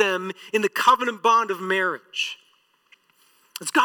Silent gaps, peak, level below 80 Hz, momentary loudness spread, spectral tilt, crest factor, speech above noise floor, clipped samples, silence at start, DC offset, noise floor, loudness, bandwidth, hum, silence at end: none; -6 dBFS; -72 dBFS; 12 LU; -2.5 dB/octave; 16 dB; 39 dB; under 0.1%; 0 s; under 0.1%; -61 dBFS; -22 LUFS; 19 kHz; none; 0 s